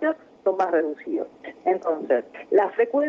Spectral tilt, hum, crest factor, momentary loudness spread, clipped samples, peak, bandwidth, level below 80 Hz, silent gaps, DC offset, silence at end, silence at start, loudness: -6.5 dB/octave; none; 18 dB; 8 LU; under 0.1%; -6 dBFS; 6.8 kHz; -74 dBFS; none; under 0.1%; 0 s; 0 s; -24 LUFS